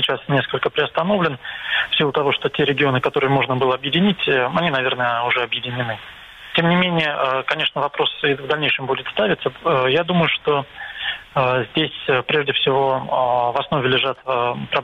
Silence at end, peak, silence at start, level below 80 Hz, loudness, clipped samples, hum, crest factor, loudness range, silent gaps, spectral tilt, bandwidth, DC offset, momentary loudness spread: 0 s; -2 dBFS; 0 s; -54 dBFS; -19 LUFS; under 0.1%; none; 18 dB; 2 LU; none; -7 dB/octave; 9.2 kHz; under 0.1%; 5 LU